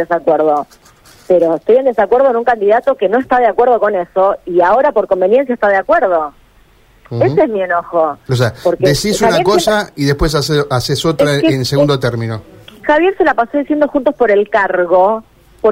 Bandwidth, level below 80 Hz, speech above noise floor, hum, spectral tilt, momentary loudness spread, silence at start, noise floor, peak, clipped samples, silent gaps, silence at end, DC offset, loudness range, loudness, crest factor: 16 kHz; -36 dBFS; 35 dB; none; -5.5 dB/octave; 5 LU; 0 s; -47 dBFS; -2 dBFS; under 0.1%; none; 0 s; under 0.1%; 2 LU; -13 LUFS; 10 dB